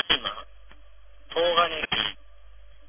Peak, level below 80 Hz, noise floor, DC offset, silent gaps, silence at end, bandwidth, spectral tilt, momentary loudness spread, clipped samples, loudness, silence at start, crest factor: -6 dBFS; -52 dBFS; -53 dBFS; 0.6%; none; 0.75 s; 3.6 kHz; -6.5 dB/octave; 15 LU; under 0.1%; -25 LUFS; 0 s; 22 dB